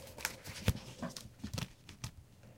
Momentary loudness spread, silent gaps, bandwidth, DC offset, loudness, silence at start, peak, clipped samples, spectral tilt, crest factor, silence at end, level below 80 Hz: 11 LU; none; 17 kHz; under 0.1%; -43 LUFS; 0 s; -16 dBFS; under 0.1%; -4 dB/octave; 28 dB; 0 s; -52 dBFS